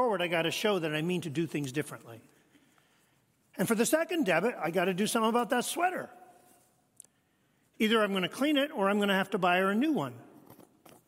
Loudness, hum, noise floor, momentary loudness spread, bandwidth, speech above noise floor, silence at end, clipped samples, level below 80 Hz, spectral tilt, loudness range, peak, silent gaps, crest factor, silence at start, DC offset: -29 LUFS; none; -71 dBFS; 9 LU; 16 kHz; 42 dB; 0.55 s; under 0.1%; -80 dBFS; -4.5 dB/octave; 5 LU; -12 dBFS; none; 18 dB; 0 s; under 0.1%